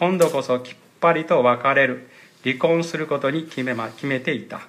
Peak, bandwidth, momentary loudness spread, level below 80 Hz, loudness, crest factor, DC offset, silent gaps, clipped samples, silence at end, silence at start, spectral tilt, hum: -4 dBFS; 15 kHz; 9 LU; -70 dBFS; -21 LUFS; 18 dB; under 0.1%; none; under 0.1%; 0.05 s; 0 s; -5.5 dB/octave; none